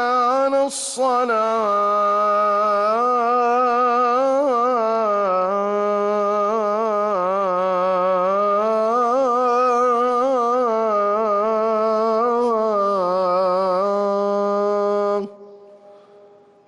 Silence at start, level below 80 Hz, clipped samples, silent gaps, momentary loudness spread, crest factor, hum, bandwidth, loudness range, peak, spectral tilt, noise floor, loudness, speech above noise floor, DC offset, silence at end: 0 s; -68 dBFS; under 0.1%; none; 3 LU; 10 dB; none; 12 kHz; 2 LU; -10 dBFS; -4.5 dB/octave; -49 dBFS; -19 LUFS; 30 dB; under 0.1%; 0.75 s